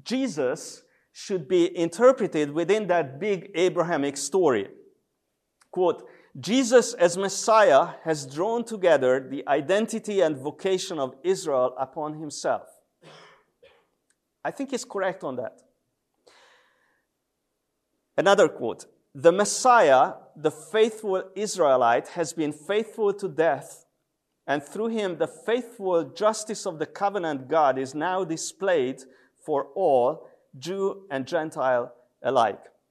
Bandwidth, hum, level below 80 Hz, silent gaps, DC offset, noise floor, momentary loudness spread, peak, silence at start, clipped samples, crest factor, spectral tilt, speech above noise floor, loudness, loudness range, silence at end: 13 kHz; none; -80 dBFS; none; under 0.1%; -79 dBFS; 13 LU; -4 dBFS; 0.05 s; under 0.1%; 20 dB; -4 dB/octave; 55 dB; -24 LUFS; 12 LU; 0.35 s